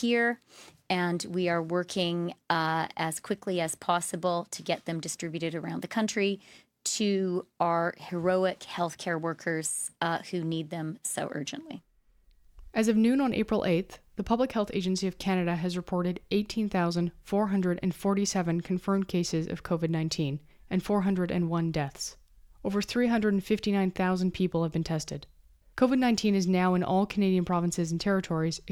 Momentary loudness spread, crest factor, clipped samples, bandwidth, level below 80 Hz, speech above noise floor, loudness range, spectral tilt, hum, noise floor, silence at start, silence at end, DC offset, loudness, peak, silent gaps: 8 LU; 20 dB; under 0.1%; 15.5 kHz; -56 dBFS; 34 dB; 4 LU; -5 dB/octave; none; -62 dBFS; 0 s; 0 s; under 0.1%; -29 LUFS; -10 dBFS; none